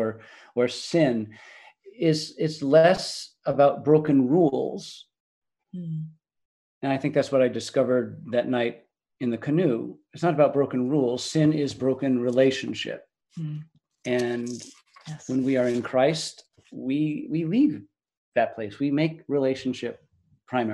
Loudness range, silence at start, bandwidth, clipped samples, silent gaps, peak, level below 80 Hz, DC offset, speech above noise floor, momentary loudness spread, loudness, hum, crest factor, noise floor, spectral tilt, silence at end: 6 LU; 0 s; 12 kHz; under 0.1%; 5.20-5.42 s, 6.45-6.81 s, 18.17-18.32 s; -6 dBFS; -68 dBFS; under 0.1%; 22 dB; 17 LU; -25 LUFS; none; 20 dB; -46 dBFS; -6 dB/octave; 0 s